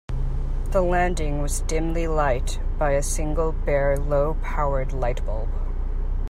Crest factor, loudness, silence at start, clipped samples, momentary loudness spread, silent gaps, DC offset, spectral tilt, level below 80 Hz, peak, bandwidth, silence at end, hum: 14 dB; -25 LUFS; 0.1 s; under 0.1%; 8 LU; none; under 0.1%; -5.5 dB/octave; -24 dBFS; -8 dBFS; 12.5 kHz; 0 s; none